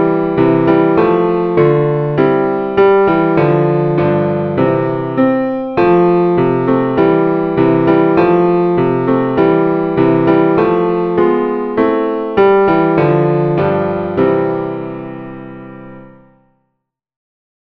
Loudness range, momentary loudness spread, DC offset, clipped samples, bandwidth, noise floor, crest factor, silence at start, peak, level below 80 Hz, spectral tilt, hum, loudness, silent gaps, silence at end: 5 LU; 6 LU; under 0.1%; under 0.1%; 5 kHz; -72 dBFS; 12 dB; 0 s; 0 dBFS; -44 dBFS; -10.5 dB/octave; none; -12 LUFS; none; 1.55 s